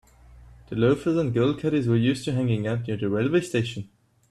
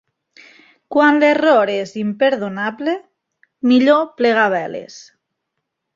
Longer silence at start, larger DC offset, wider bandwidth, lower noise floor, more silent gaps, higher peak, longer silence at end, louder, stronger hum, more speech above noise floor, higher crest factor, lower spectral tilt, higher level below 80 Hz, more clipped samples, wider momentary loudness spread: second, 0.3 s vs 0.9 s; neither; first, 12 kHz vs 7.6 kHz; second, -49 dBFS vs -76 dBFS; neither; second, -8 dBFS vs -2 dBFS; second, 0.45 s vs 0.95 s; second, -24 LUFS vs -16 LUFS; neither; second, 26 dB vs 61 dB; about the same, 16 dB vs 16 dB; first, -7 dB/octave vs -5.5 dB/octave; first, -54 dBFS vs -66 dBFS; neither; second, 8 LU vs 12 LU